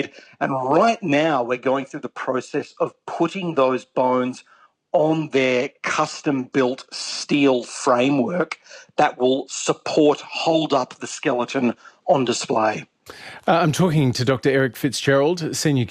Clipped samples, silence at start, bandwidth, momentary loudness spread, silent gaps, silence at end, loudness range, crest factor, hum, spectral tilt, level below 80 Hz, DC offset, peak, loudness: under 0.1%; 0 s; 14 kHz; 9 LU; none; 0 s; 2 LU; 16 dB; none; -5 dB/octave; -62 dBFS; under 0.1%; -4 dBFS; -21 LUFS